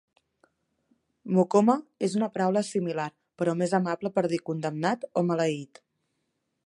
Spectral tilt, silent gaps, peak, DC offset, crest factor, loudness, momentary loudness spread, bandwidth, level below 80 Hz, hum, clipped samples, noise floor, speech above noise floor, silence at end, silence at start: -6.5 dB/octave; none; -8 dBFS; under 0.1%; 20 dB; -27 LUFS; 10 LU; 11.5 kHz; -76 dBFS; none; under 0.1%; -78 dBFS; 52 dB; 1 s; 1.25 s